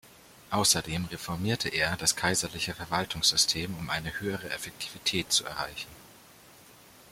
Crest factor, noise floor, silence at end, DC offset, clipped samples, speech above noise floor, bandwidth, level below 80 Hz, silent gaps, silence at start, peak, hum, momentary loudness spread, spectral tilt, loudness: 24 dB; -54 dBFS; 0 s; under 0.1%; under 0.1%; 24 dB; 16.5 kHz; -56 dBFS; none; 0.05 s; -8 dBFS; none; 11 LU; -2 dB/octave; -28 LUFS